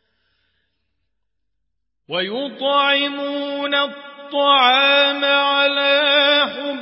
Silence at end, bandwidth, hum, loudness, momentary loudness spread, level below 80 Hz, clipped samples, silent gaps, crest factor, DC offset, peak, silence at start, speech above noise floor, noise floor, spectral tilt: 0 s; 5.8 kHz; none; -16 LUFS; 12 LU; -78 dBFS; under 0.1%; none; 16 dB; under 0.1%; -2 dBFS; 2.1 s; 61 dB; -78 dBFS; -6.5 dB/octave